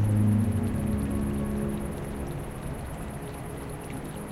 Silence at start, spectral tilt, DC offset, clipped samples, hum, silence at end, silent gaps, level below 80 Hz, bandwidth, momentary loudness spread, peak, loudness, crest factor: 0 s; -7.5 dB/octave; under 0.1%; under 0.1%; none; 0 s; none; -40 dBFS; 13.5 kHz; 13 LU; -14 dBFS; -31 LUFS; 16 dB